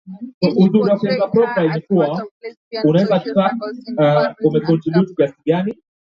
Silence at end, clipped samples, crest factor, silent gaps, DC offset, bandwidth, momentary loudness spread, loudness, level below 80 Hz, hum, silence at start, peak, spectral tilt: 0.4 s; under 0.1%; 16 dB; 0.34-0.41 s, 2.31-2.41 s, 2.57-2.71 s; under 0.1%; 6 kHz; 12 LU; -17 LUFS; -60 dBFS; none; 0.05 s; -2 dBFS; -9 dB/octave